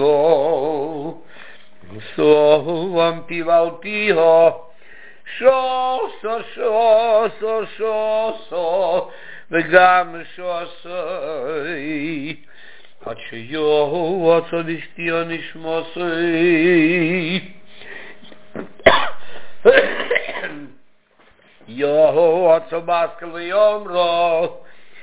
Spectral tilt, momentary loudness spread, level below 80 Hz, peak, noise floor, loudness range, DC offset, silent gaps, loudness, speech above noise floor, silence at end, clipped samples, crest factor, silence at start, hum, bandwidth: -9 dB/octave; 18 LU; -56 dBFS; 0 dBFS; -53 dBFS; 4 LU; 1%; none; -18 LUFS; 36 dB; 0 s; under 0.1%; 18 dB; 0 s; none; 4 kHz